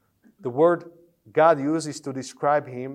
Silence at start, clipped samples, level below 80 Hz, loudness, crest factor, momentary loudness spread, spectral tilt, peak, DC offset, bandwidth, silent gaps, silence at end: 0.45 s; under 0.1%; -78 dBFS; -23 LUFS; 20 dB; 14 LU; -6 dB/octave; -4 dBFS; under 0.1%; 12 kHz; none; 0 s